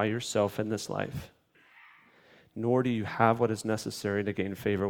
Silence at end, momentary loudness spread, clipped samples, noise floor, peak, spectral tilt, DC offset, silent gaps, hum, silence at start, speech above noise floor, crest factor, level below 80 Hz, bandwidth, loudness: 0 s; 9 LU; under 0.1%; -60 dBFS; -6 dBFS; -5.5 dB/octave; under 0.1%; none; none; 0 s; 31 dB; 24 dB; -62 dBFS; 18.5 kHz; -30 LUFS